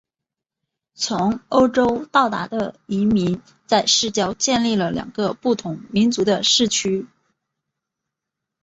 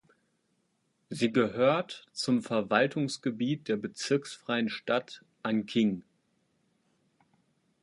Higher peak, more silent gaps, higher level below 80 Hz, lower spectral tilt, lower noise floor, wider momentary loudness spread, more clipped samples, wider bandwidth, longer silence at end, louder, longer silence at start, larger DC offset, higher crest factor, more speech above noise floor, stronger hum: first, -2 dBFS vs -8 dBFS; neither; first, -54 dBFS vs -74 dBFS; second, -3.5 dB/octave vs -5 dB/octave; first, -85 dBFS vs -75 dBFS; about the same, 9 LU vs 8 LU; neither; second, 8.2 kHz vs 11.5 kHz; second, 1.55 s vs 1.8 s; first, -19 LUFS vs -30 LUFS; about the same, 1 s vs 1.1 s; neither; second, 18 dB vs 24 dB; first, 66 dB vs 46 dB; neither